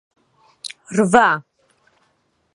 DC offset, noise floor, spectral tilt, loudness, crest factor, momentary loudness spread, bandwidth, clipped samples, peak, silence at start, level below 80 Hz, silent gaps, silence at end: under 0.1%; -65 dBFS; -5 dB/octave; -17 LUFS; 22 dB; 20 LU; 11.5 kHz; under 0.1%; 0 dBFS; 0.65 s; -60 dBFS; none; 1.15 s